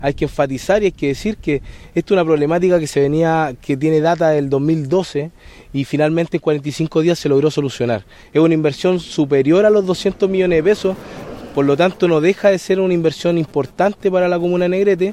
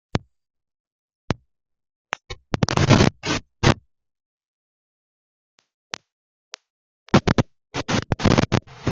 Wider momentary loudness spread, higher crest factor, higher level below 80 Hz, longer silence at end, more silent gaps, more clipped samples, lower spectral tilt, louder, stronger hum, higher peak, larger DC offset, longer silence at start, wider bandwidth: second, 7 LU vs 19 LU; second, 14 dB vs 24 dB; about the same, -42 dBFS vs -40 dBFS; about the same, 0 s vs 0 s; second, none vs 0.80-1.09 s, 1.15-1.28 s, 1.96-2.05 s, 4.26-5.58 s, 5.74-5.90 s, 6.12-6.52 s, 6.70-7.06 s; neither; about the same, -6.5 dB/octave vs -5.5 dB/octave; first, -16 LUFS vs -22 LUFS; neither; about the same, -2 dBFS vs 0 dBFS; neither; second, 0 s vs 0.15 s; first, 13.5 kHz vs 8.8 kHz